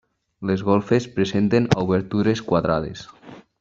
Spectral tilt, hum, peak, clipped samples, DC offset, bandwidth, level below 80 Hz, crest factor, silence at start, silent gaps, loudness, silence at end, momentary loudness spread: -7 dB/octave; none; -2 dBFS; under 0.1%; under 0.1%; 7.8 kHz; -50 dBFS; 20 dB; 0.4 s; none; -21 LUFS; 0.2 s; 12 LU